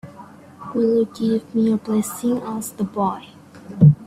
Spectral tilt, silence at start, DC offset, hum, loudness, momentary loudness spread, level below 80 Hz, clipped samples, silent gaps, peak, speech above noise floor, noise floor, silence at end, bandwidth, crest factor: -8 dB/octave; 0.05 s; under 0.1%; none; -21 LUFS; 16 LU; -54 dBFS; under 0.1%; none; -2 dBFS; 23 dB; -42 dBFS; 0 s; 14.5 kHz; 18 dB